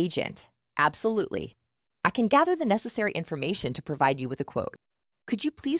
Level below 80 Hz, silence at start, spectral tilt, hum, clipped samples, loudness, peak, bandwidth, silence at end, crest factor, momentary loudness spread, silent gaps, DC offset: -60 dBFS; 0 s; -4.5 dB/octave; none; under 0.1%; -28 LUFS; -6 dBFS; 4 kHz; 0 s; 22 dB; 12 LU; none; under 0.1%